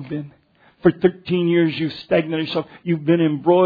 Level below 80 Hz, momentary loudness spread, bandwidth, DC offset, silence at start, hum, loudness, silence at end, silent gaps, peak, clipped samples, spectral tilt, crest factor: -58 dBFS; 8 LU; 5 kHz; under 0.1%; 0 s; none; -20 LUFS; 0 s; none; 0 dBFS; under 0.1%; -9.5 dB/octave; 18 dB